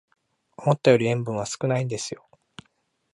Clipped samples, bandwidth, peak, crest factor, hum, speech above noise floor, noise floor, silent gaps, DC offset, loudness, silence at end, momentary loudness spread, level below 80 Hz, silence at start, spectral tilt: under 0.1%; 11.5 kHz; -4 dBFS; 22 dB; none; 48 dB; -70 dBFS; none; under 0.1%; -24 LUFS; 1 s; 13 LU; -64 dBFS; 0.6 s; -5.5 dB/octave